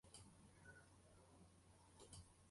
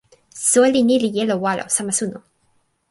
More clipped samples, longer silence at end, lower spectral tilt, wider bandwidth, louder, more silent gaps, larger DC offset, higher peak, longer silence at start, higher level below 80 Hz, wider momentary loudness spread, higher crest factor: neither; second, 0 s vs 0.7 s; about the same, -3.5 dB/octave vs -3.5 dB/octave; about the same, 11.5 kHz vs 12 kHz; second, -66 LUFS vs -18 LUFS; neither; neither; second, -44 dBFS vs -4 dBFS; second, 0.05 s vs 0.35 s; second, -76 dBFS vs -62 dBFS; about the same, 7 LU vs 8 LU; first, 22 dB vs 16 dB